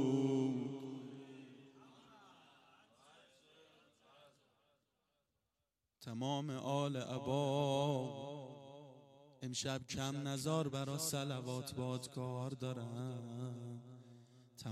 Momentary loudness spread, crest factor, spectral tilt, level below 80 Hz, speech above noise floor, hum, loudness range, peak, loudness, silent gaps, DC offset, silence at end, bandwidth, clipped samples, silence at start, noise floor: 24 LU; 18 dB; -5.5 dB/octave; -78 dBFS; 48 dB; none; 11 LU; -24 dBFS; -41 LUFS; none; under 0.1%; 0 s; 15.5 kHz; under 0.1%; 0 s; -89 dBFS